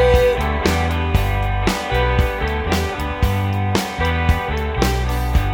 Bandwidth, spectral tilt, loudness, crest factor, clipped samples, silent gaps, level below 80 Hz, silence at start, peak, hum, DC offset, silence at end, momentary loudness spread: 18.5 kHz; -5.5 dB/octave; -19 LUFS; 18 dB; under 0.1%; none; -22 dBFS; 0 s; 0 dBFS; none; under 0.1%; 0 s; 3 LU